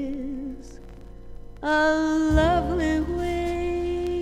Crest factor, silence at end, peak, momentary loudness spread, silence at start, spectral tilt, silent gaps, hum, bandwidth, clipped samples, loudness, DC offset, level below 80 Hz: 18 dB; 0 s; -8 dBFS; 14 LU; 0 s; -6.5 dB/octave; none; none; 12.5 kHz; under 0.1%; -24 LUFS; under 0.1%; -34 dBFS